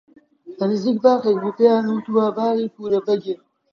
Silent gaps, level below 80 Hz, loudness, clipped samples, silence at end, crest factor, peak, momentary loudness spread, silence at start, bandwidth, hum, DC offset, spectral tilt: none; -70 dBFS; -19 LUFS; under 0.1%; 0.35 s; 18 dB; -2 dBFS; 7 LU; 0.45 s; 6.8 kHz; none; under 0.1%; -7.5 dB/octave